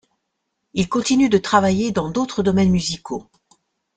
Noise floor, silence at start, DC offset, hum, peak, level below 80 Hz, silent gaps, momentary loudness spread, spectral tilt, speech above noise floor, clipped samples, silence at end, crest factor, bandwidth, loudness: -75 dBFS; 0.75 s; under 0.1%; none; -2 dBFS; -48 dBFS; none; 12 LU; -5.5 dB/octave; 57 dB; under 0.1%; 0.75 s; 18 dB; 9.2 kHz; -19 LUFS